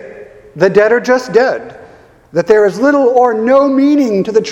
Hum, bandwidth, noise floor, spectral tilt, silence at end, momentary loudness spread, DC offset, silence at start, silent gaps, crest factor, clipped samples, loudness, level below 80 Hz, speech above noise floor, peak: none; 11.5 kHz; -40 dBFS; -6 dB/octave; 0 s; 6 LU; under 0.1%; 0 s; none; 12 dB; 0.1%; -11 LUFS; -52 dBFS; 30 dB; 0 dBFS